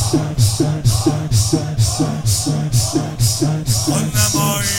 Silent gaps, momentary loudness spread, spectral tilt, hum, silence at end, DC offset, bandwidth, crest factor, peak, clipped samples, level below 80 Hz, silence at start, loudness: none; 3 LU; -4.5 dB/octave; none; 0 s; under 0.1%; 17 kHz; 16 dB; 0 dBFS; under 0.1%; -34 dBFS; 0 s; -16 LUFS